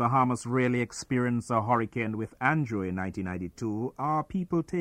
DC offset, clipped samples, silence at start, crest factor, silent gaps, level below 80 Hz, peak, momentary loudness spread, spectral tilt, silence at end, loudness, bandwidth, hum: under 0.1%; under 0.1%; 0 s; 18 dB; none; -58 dBFS; -10 dBFS; 7 LU; -7 dB/octave; 0 s; -29 LUFS; 11.5 kHz; none